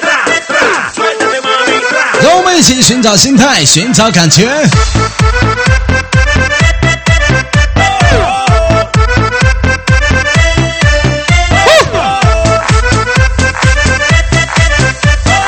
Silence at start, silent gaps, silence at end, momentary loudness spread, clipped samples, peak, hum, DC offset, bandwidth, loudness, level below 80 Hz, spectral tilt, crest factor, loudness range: 0 s; none; 0 s; 5 LU; 0.9%; 0 dBFS; none; under 0.1%; over 20 kHz; -8 LUFS; -16 dBFS; -4 dB/octave; 8 dB; 3 LU